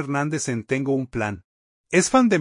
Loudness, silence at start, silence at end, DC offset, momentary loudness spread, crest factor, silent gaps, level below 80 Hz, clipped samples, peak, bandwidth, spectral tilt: -22 LUFS; 0 s; 0 s; under 0.1%; 11 LU; 18 dB; 1.44-1.84 s; -54 dBFS; under 0.1%; -6 dBFS; 11 kHz; -5 dB/octave